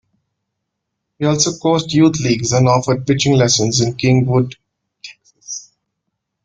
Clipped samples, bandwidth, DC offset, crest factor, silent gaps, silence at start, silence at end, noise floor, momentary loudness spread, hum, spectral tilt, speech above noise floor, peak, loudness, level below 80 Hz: under 0.1%; 9.4 kHz; under 0.1%; 16 dB; none; 1.2 s; 0.85 s; -76 dBFS; 16 LU; none; -5 dB/octave; 62 dB; -2 dBFS; -15 LUFS; -48 dBFS